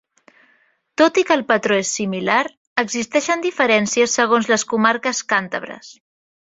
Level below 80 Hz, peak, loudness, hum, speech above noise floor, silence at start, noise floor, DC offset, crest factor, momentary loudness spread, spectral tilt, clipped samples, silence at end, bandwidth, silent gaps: -64 dBFS; -2 dBFS; -18 LUFS; none; 42 dB; 1 s; -60 dBFS; under 0.1%; 18 dB; 7 LU; -3 dB/octave; under 0.1%; 0.65 s; 8 kHz; 2.57-2.76 s